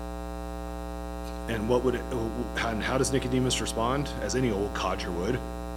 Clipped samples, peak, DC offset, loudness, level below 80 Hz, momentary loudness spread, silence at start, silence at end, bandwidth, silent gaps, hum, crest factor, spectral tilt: under 0.1%; -12 dBFS; under 0.1%; -29 LUFS; -38 dBFS; 11 LU; 0 s; 0 s; 16.5 kHz; none; 60 Hz at -35 dBFS; 18 dB; -5 dB/octave